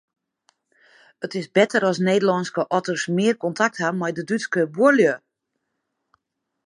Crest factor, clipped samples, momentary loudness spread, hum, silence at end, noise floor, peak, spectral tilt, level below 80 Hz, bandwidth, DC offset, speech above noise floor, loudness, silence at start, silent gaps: 20 dB; under 0.1%; 9 LU; none; 1.5 s; -79 dBFS; -2 dBFS; -5.5 dB/octave; -74 dBFS; 11 kHz; under 0.1%; 58 dB; -21 LUFS; 1.2 s; none